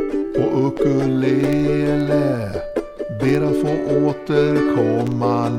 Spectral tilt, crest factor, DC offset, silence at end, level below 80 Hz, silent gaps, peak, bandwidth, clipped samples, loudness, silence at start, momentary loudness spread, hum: -8 dB/octave; 14 dB; under 0.1%; 0 s; -42 dBFS; none; -4 dBFS; 12.5 kHz; under 0.1%; -19 LUFS; 0 s; 6 LU; none